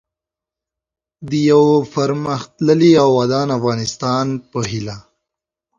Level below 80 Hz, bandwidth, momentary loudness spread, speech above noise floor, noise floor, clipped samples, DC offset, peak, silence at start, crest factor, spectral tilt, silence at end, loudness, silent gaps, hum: -52 dBFS; 7.6 kHz; 12 LU; 71 dB; -87 dBFS; under 0.1%; under 0.1%; 0 dBFS; 1.2 s; 16 dB; -6 dB/octave; 0.8 s; -16 LUFS; none; none